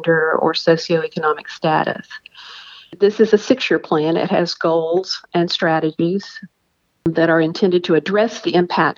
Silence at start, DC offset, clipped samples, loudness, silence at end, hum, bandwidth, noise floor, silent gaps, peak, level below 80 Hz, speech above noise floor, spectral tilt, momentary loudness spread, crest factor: 0 s; under 0.1%; under 0.1%; -17 LUFS; 0.05 s; none; 7.4 kHz; -66 dBFS; none; 0 dBFS; -62 dBFS; 49 dB; -6 dB/octave; 18 LU; 18 dB